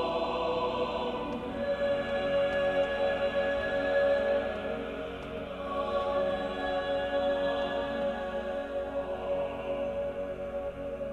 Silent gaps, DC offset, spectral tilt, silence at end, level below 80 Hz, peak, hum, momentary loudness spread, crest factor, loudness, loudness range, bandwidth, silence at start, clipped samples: none; under 0.1%; -6 dB/octave; 0 s; -52 dBFS; -16 dBFS; none; 8 LU; 14 dB; -31 LUFS; 4 LU; 8.8 kHz; 0 s; under 0.1%